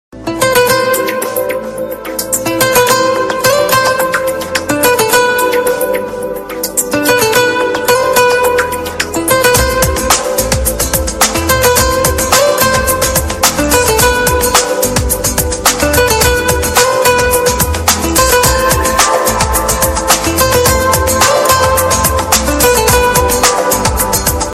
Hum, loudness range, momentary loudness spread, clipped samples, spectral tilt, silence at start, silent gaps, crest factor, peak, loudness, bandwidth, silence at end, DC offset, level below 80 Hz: none; 2 LU; 6 LU; under 0.1%; -2.5 dB/octave; 0.15 s; none; 12 dB; 0 dBFS; -10 LUFS; 17 kHz; 0 s; under 0.1%; -24 dBFS